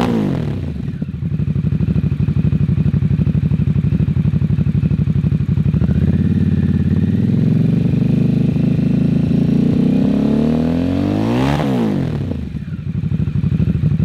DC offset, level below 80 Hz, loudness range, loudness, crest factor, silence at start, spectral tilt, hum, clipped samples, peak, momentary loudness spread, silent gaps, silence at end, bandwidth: under 0.1%; -30 dBFS; 3 LU; -16 LUFS; 12 dB; 0 s; -9.5 dB/octave; none; under 0.1%; -2 dBFS; 7 LU; none; 0 s; 7.2 kHz